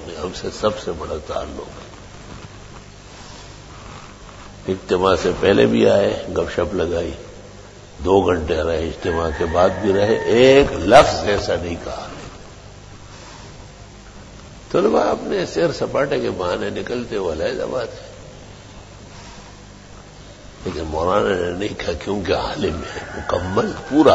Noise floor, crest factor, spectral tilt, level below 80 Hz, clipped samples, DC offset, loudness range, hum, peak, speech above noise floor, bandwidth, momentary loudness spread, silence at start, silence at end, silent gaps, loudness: -40 dBFS; 20 dB; -5.5 dB/octave; -38 dBFS; under 0.1%; under 0.1%; 15 LU; 50 Hz at -45 dBFS; 0 dBFS; 22 dB; 10.5 kHz; 25 LU; 0 s; 0 s; none; -19 LUFS